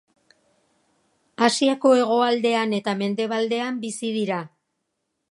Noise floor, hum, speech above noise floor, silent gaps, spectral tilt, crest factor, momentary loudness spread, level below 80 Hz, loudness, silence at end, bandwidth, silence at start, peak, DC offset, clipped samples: -77 dBFS; none; 56 dB; none; -4 dB/octave; 22 dB; 10 LU; -78 dBFS; -22 LUFS; 0.85 s; 11.5 kHz; 1.4 s; -2 dBFS; under 0.1%; under 0.1%